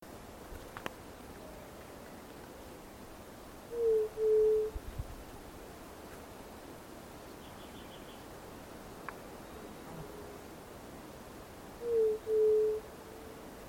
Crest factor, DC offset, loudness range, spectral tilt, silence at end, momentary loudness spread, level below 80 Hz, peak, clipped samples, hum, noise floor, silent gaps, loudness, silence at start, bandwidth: 18 dB; under 0.1%; 14 LU; -5 dB/octave; 0 s; 19 LU; -56 dBFS; -20 dBFS; under 0.1%; none; -50 dBFS; none; -34 LUFS; 0 s; 16.5 kHz